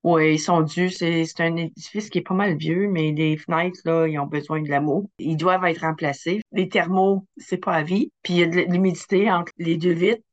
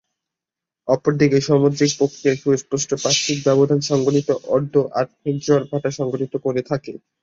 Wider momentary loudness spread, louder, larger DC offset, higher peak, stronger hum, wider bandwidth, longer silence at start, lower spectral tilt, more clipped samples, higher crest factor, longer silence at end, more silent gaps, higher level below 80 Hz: about the same, 7 LU vs 8 LU; second, -22 LUFS vs -19 LUFS; neither; second, -6 dBFS vs -2 dBFS; neither; first, 8.6 kHz vs 7.8 kHz; second, 0.05 s vs 0.85 s; about the same, -6 dB/octave vs -5 dB/octave; neither; about the same, 16 dB vs 18 dB; about the same, 0.15 s vs 0.25 s; first, 6.42-6.46 s vs none; second, -70 dBFS vs -58 dBFS